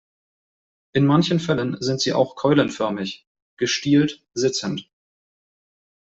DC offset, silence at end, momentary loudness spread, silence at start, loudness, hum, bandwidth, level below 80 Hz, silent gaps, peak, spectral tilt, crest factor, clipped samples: under 0.1%; 1.2 s; 11 LU; 0.95 s; -21 LUFS; none; 8 kHz; -60 dBFS; 3.27-3.35 s, 3.42-3.57 s; -4 dBFS; -5.5 dB/octave; 20 dB; under 0.1%